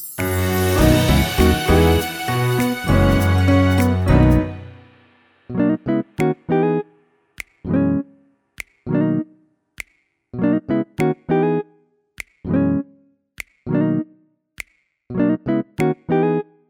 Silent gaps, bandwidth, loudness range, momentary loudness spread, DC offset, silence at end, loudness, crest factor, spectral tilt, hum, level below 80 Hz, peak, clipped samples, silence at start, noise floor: none; over 20 kHz; 8 LU; 21 LU; under 0.1%; 0.3 s; -19 LUFS; 16 dB; -6.5 dB/octave; none; -30 dBFS; -2 dBFS; under 0.1%; 0 s; -63 dBFS